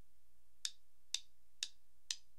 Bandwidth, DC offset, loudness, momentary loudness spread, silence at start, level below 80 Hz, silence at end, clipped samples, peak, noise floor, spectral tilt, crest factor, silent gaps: 15.5 kHz; 0.3%; -46 LUFS; 2 LU; 0.65 s; -82 dBFS; 0.2 s; under 0.1%; -18 dBFS; -78 dBFS; 3 dB/octave; 34 dB; none